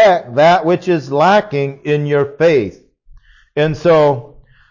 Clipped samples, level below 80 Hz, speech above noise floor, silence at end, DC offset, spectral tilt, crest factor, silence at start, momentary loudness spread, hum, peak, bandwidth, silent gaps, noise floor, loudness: under 0.1%; -48 dBFS; 31 dB; 0.45 s; under 0.1%; -6.5 dB/octave; 12 dB; 0 s; 9 LU; none; -2 dBFS; 7.4 kHz; none; -44 dBFS; -14 LUFS